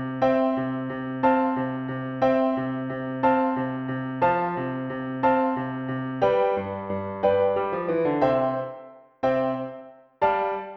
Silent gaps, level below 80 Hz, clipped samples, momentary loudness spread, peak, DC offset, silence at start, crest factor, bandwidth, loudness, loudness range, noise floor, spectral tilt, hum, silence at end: none; -58 dBFS; under 0.1%; 9 LU; -6 dBFS; under 0.1%; 0 s; 18 dB; 6 kHz; -25 LUFS; 1 LU; -45 dBFS; -9 dB/octave; none; 0 s